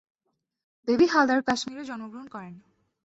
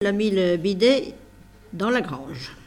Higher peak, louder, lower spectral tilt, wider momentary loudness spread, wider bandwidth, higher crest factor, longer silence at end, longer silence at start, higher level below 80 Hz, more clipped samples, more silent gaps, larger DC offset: about the same, -8 dBFS vs -6 dBFS; about the same, -24 LUFS vs -22 LUFS; second, -4 dB/octave vs -5.5 dB/octave; first, 21 LU vs 16 LU; second, 8 kHz vs 13.5 kHz; about the same, 18 dB vs 16 dB; first, 0.45 s vs 0.05 s; first, 0.85 s vs 0 s; second, -64 dBFS vs -54 dBFS; neither; neither; neither